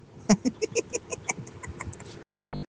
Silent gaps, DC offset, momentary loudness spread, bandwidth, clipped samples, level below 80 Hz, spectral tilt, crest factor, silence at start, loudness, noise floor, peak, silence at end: none; under 0.1%; 19 LU; 10 kHz; under 0.1%; -54 dBFS; -4.5 dB/octave; 22 dB; 0.1 s; -30 LUFS; -48 dBFS; -10 dBFS; 0.05 s